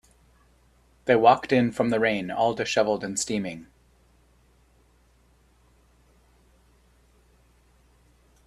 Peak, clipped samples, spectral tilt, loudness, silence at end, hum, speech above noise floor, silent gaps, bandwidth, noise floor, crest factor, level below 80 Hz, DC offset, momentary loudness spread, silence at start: -4 dBFS; under 0.1%; -4.5 dB/octave; -24 LUFS; 4.85 s; none; 38 dB; none; 13.5 kHz; -61 dBFS; 24 dB; -60 dBFS; under 0.1%; 13 LU; 1.05 s